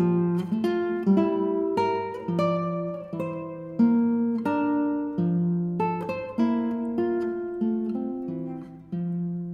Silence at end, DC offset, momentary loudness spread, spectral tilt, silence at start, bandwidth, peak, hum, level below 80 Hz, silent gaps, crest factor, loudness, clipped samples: 0 s; under 0.1%; 10 LU; -9.5 dB/octave; 0 s; 6.4 kHz; -10 dBFS; none; -64 dBFS; none; 14 dB; -26 LUFS; under 0.1%